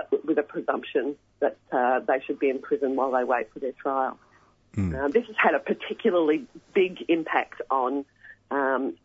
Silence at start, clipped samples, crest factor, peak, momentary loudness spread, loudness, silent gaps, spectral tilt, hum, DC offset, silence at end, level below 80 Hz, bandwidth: 0 s; under 0.1%; 18 dB; -8 dBFS; 8 LU; -26 LUFS; none; -7.5 dB/octave; none; under 0.1%; 0.1 s; -56 dBFS; 7.8 kHz